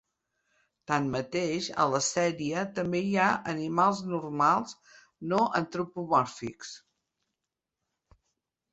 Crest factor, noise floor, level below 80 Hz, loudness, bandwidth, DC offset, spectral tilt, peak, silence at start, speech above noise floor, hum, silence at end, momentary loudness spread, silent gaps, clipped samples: 20 dB; -87 dBFS; -68 dBFS; -28 LUFS; 8.2 kHz; under 0.1%; -4.5 dB/octave; -10 dBFS; 0.9 s; 59 dB; none; 1.95 s; 14 LU; none; under 0.1%